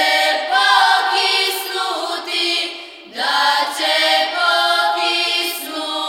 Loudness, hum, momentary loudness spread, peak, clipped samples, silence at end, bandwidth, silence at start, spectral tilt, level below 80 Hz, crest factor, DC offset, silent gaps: -16 LUFS; none; 9 LU; 0 dBFS; under 0.1%; 0 s; 18 kHz; 0 s; 1.5 dB/octave; -74 dBFS; 16 dB; under 0.1%; none